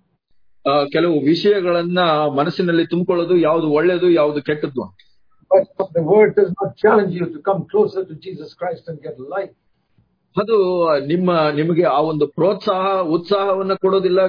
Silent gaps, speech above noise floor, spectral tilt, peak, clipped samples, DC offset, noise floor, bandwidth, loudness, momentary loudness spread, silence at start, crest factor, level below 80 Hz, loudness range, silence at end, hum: none; 45 dB; -8.5 dB/octave; -2 dBFS; under 0.1%; under 0.1%; -61 dBFS; 5.2 kHz; -17 LUFS; 12 LU; 0.65 s; 16 dB; -62 dBFS; 6 LU; 0 s; none